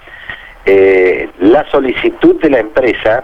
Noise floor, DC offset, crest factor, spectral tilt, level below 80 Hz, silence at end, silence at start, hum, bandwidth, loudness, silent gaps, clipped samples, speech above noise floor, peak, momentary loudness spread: -29 dBFS; under 0.1%; 10 dB; -7 dB/octave; -38 dBFS; 0 s; 0.1 s; none; 5.6 kHz; -10 LUFS; none; under 0.1%; 20 dB; 0 dBFS; 12 LU